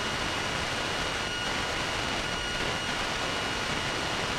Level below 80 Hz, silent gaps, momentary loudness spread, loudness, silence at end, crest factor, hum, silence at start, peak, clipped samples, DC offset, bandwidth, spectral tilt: -46 dBFS; none; 0 LU; -29 LUFS; 0 s; 14 dB; none; 0 s; -16 dBFS; under 0.1%; under 0.1%; 16 kHz; -2.5 dB/octave